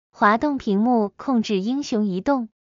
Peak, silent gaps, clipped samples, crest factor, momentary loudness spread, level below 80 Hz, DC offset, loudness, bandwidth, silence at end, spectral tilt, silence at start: -4 dBFS; none; under 0.1%; 16 dB; 5 LU; -56 dBFS; under 0.1%; -21 LUFS; 7.6 kHz; 0.2 s; -6 dB/octave; 0.2 s